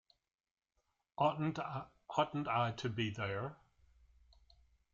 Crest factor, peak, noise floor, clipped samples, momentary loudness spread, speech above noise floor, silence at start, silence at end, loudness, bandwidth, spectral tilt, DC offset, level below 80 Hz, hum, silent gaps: 20 dB; -20 dBFS; -84 dBFS; under 0.1%; 10 LU; 46 dB; 1.2 s; 1.4 s; -38 LUFS; 7.6 kHz; -6.5 dB/octave; under 0.1%; -70 dBFS; none; none